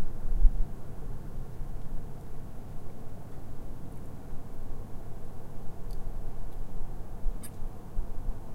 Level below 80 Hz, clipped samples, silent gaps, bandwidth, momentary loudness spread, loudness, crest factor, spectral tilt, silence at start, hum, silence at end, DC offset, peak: -32 dBFS; under 0.1%; none; 10 kHz; 8 LU; -41 LUFS; 22 dB; -7 dB/octave; 0 s; none; 0 s; under 0.1%; -6 dBFS